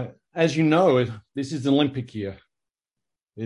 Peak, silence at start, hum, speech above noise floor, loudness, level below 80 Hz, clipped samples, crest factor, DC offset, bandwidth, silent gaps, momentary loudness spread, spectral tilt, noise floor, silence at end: -6 dBFS; 0 s; none; 63 dB; -22 LUFS; -60 dBFS; under 0.1%; 18 dB; under 0.1%; 11 kHz; none; 15 LU; -6.5 dB/octave; -86 dBFS; 0 s